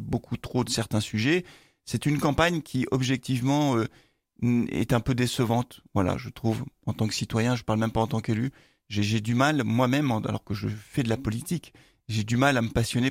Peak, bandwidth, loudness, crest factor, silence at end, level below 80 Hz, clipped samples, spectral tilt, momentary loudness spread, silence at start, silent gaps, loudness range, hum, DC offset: -6 dBFS; 16 kHz; -27 LUFS; 20 dB; 0 s; -50 dBFS; under 0.1%; -5.5 dB/octave; 8 LU; 0 s; none; 2 LU; none; under 0.1%